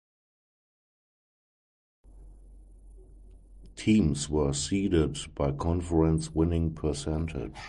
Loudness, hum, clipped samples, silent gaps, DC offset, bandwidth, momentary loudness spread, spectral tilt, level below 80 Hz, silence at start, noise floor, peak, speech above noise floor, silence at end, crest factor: -28 LUFS; none; under 0.1%; none; under 0.1%; 11.5 kHz; 7 LU; -6 dB/octave; -40 dBFS; 2.1 s; -51 dBFS; -12 dBFS; 24 dB; 0 s; 18 dB